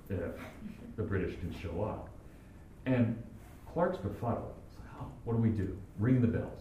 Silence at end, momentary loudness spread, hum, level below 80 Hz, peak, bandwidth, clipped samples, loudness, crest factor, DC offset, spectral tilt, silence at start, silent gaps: 0 s; 20 LU; none; -52 dBFS; -16 dBFS; 13.5 kHz; under 0.1%; -35 LUFS; 18 dB; under 0.1%; -9 dB/octave; 0 s; none